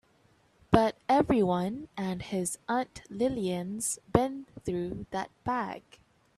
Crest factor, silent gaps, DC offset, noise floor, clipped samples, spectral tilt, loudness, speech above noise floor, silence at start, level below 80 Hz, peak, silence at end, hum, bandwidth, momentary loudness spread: 26 dB; none; under 0.1%; -65 dBFS; under 0.1%; -5.5 dB/octave; -30 LUFS; 35 dB; 0.7 s; -54 dBFS; -4 dBFS; 0.6 s; none; 14 kHz; 10 LU